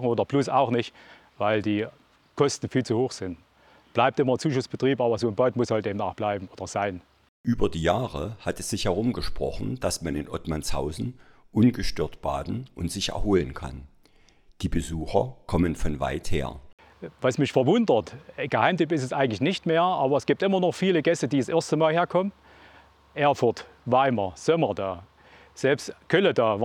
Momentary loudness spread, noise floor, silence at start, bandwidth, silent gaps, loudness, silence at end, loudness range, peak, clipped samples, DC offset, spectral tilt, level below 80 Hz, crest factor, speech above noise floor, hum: 11 LU; -57 dBFS; 0 s; 15.5 kHz; 7.29-7.44 s, 16.73-16.78 s; -26 LUFS; 0 s; 6 LU; -6 dBFS; under 0.1%; under 0.1%; -5.5 dB/octave; -44 dBFS; 20 dB; 33 dB; none